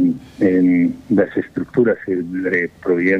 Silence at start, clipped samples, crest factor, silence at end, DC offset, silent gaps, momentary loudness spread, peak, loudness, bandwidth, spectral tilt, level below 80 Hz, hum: 0 s; under 0.1%; 14 dB; 0 s; under 0.1%; none; 7 LU; -4 dBFS; -18 LUFS; 4.9 kHz; -9 dB/octave; -54 dBFS; none